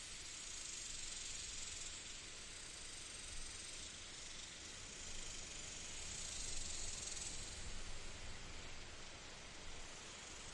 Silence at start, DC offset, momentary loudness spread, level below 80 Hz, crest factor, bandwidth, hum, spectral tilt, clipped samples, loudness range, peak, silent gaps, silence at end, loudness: 0 s; under 0.1%; 7 LU; -56 dBFS; 16 dB; 11.5 kHz; none; -1 dB/octave; under 0.1%; 3 LU; -32 dBFS; none; 0 s; -48 LUFS